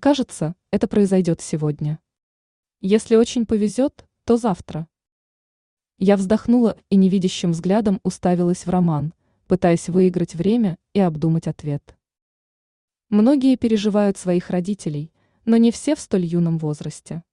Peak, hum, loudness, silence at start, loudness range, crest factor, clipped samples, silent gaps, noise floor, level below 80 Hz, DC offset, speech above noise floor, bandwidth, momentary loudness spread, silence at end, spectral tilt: -4 dBFS; none; -20 LUFS; 0 s; 3 LU; 16 dB; under 0.1%; 2.23-2.63 s, 5.12-5.77 s, 12.22-12.88 s; under -90 dBFS; -52 dBFS; under 0.1%; over 71 dB; 11 kHz; 12 LU; 0.15 s; -7 dB/octave